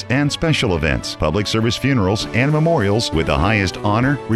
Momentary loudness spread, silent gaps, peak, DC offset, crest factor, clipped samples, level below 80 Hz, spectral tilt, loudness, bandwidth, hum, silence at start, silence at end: 3 LU; none; -4 dBFS; 0.1%; 14 dB; under 0.1%; -32 dBFS; -5.5 dB/octave; -17 LUFS; 13 kHz; none; 0 s; 0 s